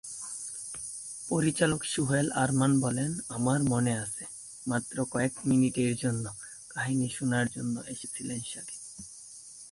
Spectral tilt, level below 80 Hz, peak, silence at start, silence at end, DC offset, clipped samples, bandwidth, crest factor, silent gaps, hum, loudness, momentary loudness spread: -5 dB/octave; -60 dBFS; -12 dBFS; 0.05 s; 0 s; under 0.1%; under 0.1%; 11.5 kHz; 18 dB; none; none; -30 LUFS; 14 LU